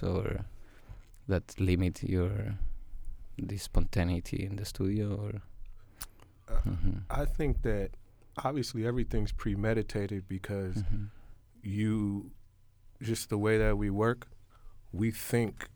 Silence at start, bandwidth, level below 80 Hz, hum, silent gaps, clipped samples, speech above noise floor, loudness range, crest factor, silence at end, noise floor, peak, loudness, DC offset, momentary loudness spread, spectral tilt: 0 s; over 20 kHz; -38 dBFS; none; none; under 0.1%; 27 dB; 4 LU; 18 dB; 0.05 s; -58 dBFS; -14 dBFS; -34 LUFS; under 0.1%; 16 LU; -6.5 dB/octave